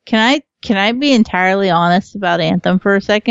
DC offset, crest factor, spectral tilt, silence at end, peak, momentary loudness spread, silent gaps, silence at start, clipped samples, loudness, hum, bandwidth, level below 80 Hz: under 0.1%; 14 dB; -5.5 dB/octave; 0 s; 0 dBFS; 4 LU; none; 0.05 s; under 0.1%; -14 LUFS; none; 7.8 kHz; -50 dBFS